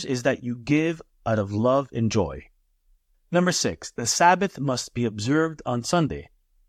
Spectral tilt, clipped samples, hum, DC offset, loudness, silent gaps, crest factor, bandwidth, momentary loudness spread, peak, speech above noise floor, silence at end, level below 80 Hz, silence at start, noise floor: -4.5 dB/octave; under 0.1%; none; under 0.1%; -24 LUFS; none; 20 dB; 15.5 kHz; 9 LU; -4 dBFS; 40 dB; 0.45 s; -52 dBFS; 0 s; -64 dBFS